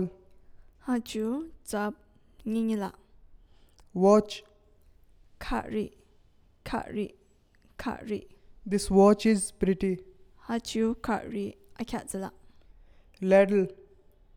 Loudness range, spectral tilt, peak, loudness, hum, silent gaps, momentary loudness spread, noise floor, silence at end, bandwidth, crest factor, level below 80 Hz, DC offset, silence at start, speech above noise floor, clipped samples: 10 LU; -6 dB/octave; -10 dBFS; -29 LUFS; none; none; 18 LU; -62 dBFS; 0.6 s; 16 kHz; 20 dB; -52 dBFS; under 0.1%; 0 s; 35 dB; under 0.1%